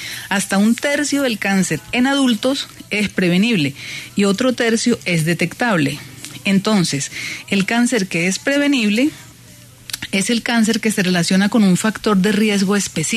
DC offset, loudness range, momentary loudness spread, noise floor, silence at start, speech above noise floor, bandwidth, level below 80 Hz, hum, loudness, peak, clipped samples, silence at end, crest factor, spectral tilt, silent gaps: under 0.1%; 2 LU; 7 LU; -42 dBFS; 0 s; 25 dB; 13.5 kHz; -54 dBFS; none; -17 LUFS; -4 dBFS; under 0.1%; 0 s; 14 dB; -4.5 dB/octave; none